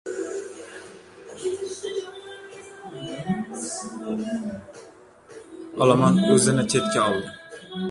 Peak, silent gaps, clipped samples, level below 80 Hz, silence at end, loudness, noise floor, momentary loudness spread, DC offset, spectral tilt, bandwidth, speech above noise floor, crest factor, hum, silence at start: -4 dBFS; none; under 0.1%; -60 dBFS; 0 s; -24 LUFS; -48 dBFS; 24 LU; under 0.1%; -5 dB/octave; 11.5 kHz; 26 dB; 22 dB; none; 0.05 s